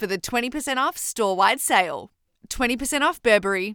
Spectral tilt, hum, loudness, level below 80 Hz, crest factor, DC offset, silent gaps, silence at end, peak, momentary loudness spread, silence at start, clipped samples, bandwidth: -2 dB/octave; none; -22 LUFS; -48 dBFS; 18 dB; under 0.1%; none; 0 s; -6 dBFS; 6 LU; 0 s; under 0.1%; over 20 kHz